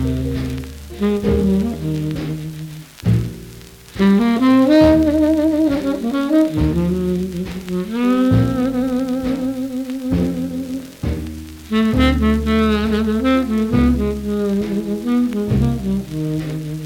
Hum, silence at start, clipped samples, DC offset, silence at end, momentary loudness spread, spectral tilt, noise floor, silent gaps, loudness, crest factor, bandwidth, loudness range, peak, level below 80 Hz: none; 0 s; under 0.1%; under 0.1%; 0 s; 12 LU; -7.5 dB/octave; -38 dBFS; none; -18 LUFS; 16 dB; 17 kHz; 6 LU; -2 dBFS; -30 dBFS